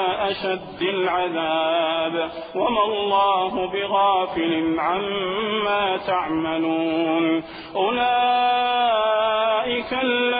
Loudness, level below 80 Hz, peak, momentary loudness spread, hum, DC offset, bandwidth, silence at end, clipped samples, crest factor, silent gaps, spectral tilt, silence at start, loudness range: -21 LUFS; -56 dBFS; -8 dBFS; 6 LU; none; under 0.1%; 5 kHz; 0 s; under 0.1%; 12 dB; none; -9 dB/octave; 0 s; 2 LU